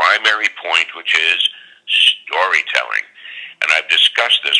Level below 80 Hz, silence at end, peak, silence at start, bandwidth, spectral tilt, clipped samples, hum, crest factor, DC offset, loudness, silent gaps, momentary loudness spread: -86 dBFS; 0 s; 0 dBFS; 0 s; 11 kHz; 3 dB/octave; under 0.1%; none; 16 dB; under 0.1%; -14 LUFS; none; 11 LU